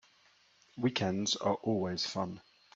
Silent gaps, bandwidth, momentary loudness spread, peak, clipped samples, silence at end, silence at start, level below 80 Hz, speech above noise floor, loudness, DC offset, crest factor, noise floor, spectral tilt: none; 8 kHz; 10 LU; -18 dBFS; under 0.1%; 0.35 s; 0.75 s; -72 dBFS; 33 dB; -34 LUFS; under 0.1%; 18 dB; -67 dBFS; -4.5 dB/octave